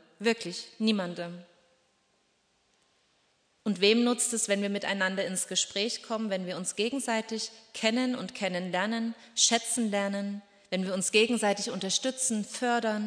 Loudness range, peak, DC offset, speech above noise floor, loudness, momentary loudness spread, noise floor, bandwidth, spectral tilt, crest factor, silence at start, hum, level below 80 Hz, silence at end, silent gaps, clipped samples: 5 LU; -10 dBFS; under 0.1%; 42 dB; -29 LUFS; 11 LU; -71 dBFS; 11 kHz; -2.5 dB/octave; 20 dB; 0.2 s; none; -82 dBFS; 0 s; none; under 0.1%